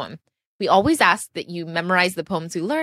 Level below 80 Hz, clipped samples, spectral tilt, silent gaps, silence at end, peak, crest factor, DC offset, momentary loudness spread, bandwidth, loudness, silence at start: -54 dBFS; under 0.1%; -4 dB/octave; 0.46-0.59 s; 0 s; -2 dBFS; 20 dB; under 0.1%; 13 LU; 15 kHz; -20 LUFS; 0 s